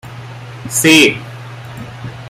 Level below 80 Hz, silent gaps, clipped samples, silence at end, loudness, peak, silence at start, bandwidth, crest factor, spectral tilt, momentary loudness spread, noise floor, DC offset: -50 dBFS; none; under 0.1%; 0 s; -10 LUFS; 0 dBFS; 0.05 s; 16 kHz; 16 dB; -3 dB/octave; 23 LU; -30 dBFS; under 0.1%